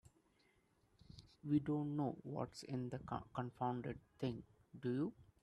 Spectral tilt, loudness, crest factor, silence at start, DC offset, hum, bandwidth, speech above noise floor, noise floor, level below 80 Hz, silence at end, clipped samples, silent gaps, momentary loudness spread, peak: -8 dB/octave; -44 LUFS; 20 dB; 1.1 s; under 0.1%; none; 11 kHz; 34 dB; -77 dBFS; -72 dBFS; 0.2 s; under 0.1%; none; 14 LU; -26 dBFS